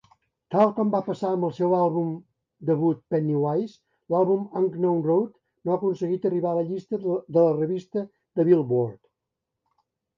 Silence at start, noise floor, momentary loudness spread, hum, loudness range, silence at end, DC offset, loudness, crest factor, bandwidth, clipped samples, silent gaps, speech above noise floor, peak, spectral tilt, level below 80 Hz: 0.5 s; -84 dBFS; 11 LU; none; 1 LU; 1.2 s; under 0.1%; -25 LUFS; 18 dB; 7.2 kHz; under 0.1%; none; 61 dB; -8 dBFS; -10 dB/octave; -72 dBFS